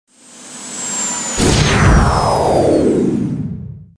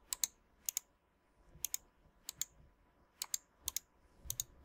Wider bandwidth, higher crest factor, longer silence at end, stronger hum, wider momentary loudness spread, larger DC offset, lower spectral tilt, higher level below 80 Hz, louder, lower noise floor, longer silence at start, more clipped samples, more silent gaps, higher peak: second, 11 kHz vs 18 kHz; second, 14 dB vs 34 dB; first, 0.15 s vs 0 s; neither; first, 15 LU vs 8 LU; neither; first, -4.5 dB/octave vs 1 dB/octave; first, -24 dBFS vs -66 dBFS; first, -14 LUFS vs -43 LUFS; second, -37 dBFS vs -75 dBFS; first, 0.35 s vs 0.1 s; neither; neither; first, 0 dBFS vs -14 dBFS